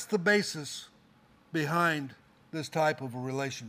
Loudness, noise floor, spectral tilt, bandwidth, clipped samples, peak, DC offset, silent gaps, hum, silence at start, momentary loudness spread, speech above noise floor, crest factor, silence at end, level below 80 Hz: -30 LUFS; -62 dBFS; -4.5 dB/octave; 15.5 kHz; under 0.1%; -12 dBFS; under 0.1%; none; none; 0 s; 14 LU; 31 dB; 20 dB; 0 s; -74 dBFS